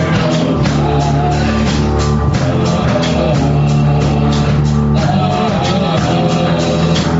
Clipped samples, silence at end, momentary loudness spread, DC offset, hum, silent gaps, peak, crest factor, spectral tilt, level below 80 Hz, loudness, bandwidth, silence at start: under 0.1%; 0 s; 1 LU; under 0.1%; none; none; -2 dBFS; 10 dB; -6 dB/octave; -24 dBFS; -13 LUFS; 8 kHz; 0 s